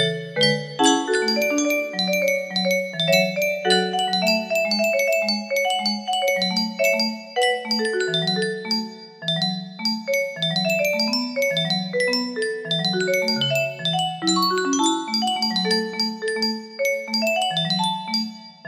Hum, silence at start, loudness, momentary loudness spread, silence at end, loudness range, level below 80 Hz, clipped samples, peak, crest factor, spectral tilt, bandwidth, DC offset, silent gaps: none; 0 s; -21 LUFS; 5 LU; 0 s; 2 LU; -68 dBFS; under 0.1%; -4 dBFS; 18 dB; -3.5 dB/octave; 15.5 kHz; under 0.1%; none